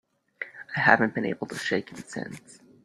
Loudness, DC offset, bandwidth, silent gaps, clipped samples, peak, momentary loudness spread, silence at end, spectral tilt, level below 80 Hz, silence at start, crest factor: -26 LUFS; under 0.1%; 13.5 kHz; none; under 0.1%; -2 dBFS; 19 LU; 0.45 s; -5 dB/octave; -66 dBFS; 0.4 s; 28 dB